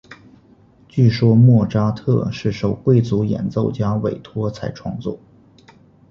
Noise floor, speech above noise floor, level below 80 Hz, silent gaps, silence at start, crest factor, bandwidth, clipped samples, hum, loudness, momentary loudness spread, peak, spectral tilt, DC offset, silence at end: -50 dBFS; 33 dB; -46 dBFS; none; 0.1 s; 16 dB; 6.8 kHz; under 0.1%; none; -18 LUFS; 14 LU; -2 dBFS; -9 dB/octave; under 0.1%; 0.95 s